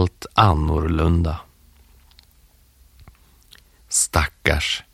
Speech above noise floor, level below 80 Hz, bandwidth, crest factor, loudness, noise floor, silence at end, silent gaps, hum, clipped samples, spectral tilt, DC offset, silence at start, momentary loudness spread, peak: 35 dB; -30 dBFS; 15.5 kHz; 22 dB; -20 LUFS; -54 dBFS; 0.15 s; none; none; under 0.1%; -4 dB/octave; under 0.1%; 0 s; 5 LU; 0 dBFS